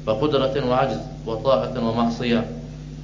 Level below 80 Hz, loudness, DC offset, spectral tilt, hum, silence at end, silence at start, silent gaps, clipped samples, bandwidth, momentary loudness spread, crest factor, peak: -42 dBFS; -22 LUFS; under 0.1%; -7 dB/octave; none; 0 s; 0 s; none; under 0.1%; 7.6 kHz; 10 LU; 18 dB; -4 dBFS